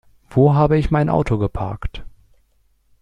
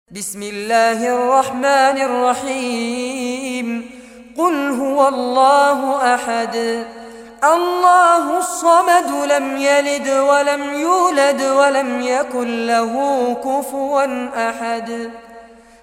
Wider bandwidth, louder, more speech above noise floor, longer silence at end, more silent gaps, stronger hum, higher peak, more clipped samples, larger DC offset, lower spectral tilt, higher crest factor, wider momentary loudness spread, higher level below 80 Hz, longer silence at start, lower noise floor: second, 8.8 kHz vs 16.5 kHz; about the same, -18 LUFS vs -16 LUFS; first, 43 dB vs 25 dB; first, 0.95 s vs 0.35 s; neither; neither; about the same, -4 dBFS vs -2 dBFS; neither; neither; first, -9.5 dB/octave vs -2.5 dB/octave; about the same, 16 dB vs 14 dB; first, 17 LU vs 11 LU; first, -34 dBFS vs -60 dBFS; first, 0.3 s vs 0.1 s; first, -60 dBFS vs -41 dBFS